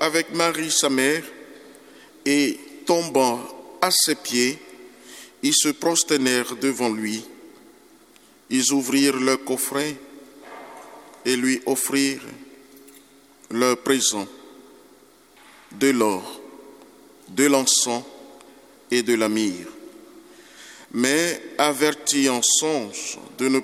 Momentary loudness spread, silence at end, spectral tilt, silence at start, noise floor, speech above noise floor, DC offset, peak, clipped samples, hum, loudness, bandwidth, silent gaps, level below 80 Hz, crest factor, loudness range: 21 LU; 0 s; -2 dB/octave; 0 s; -53 dBFS; 31 dB; under 0.1%; -2 dBFS; under 0.1%; 50 Hz at -70 dBFS; -21 LUFS; 16.5 kHz; none; -70 dBFS; 22 dB; 5 LU